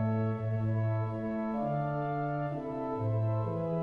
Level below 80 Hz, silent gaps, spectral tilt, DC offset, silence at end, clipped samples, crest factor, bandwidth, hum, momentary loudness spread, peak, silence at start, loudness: -58 dBFS; none; -11 dB/octave; under 0.1%; 0 s; under 0.1%; 12 dB; 4.2 kHz; none; 4 LU; -20 dBFS; 0 s; -33 LUFS